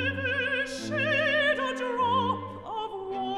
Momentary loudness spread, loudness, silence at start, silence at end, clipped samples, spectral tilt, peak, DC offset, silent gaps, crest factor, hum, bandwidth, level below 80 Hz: 11 LU; -27 LUFS; 0 s; 0 s; under 0.1%; -4.5 dB/octave; -14 dBFS; under 0.1%; none; 14 dB; none; 12.5 kHz; -62 dBFS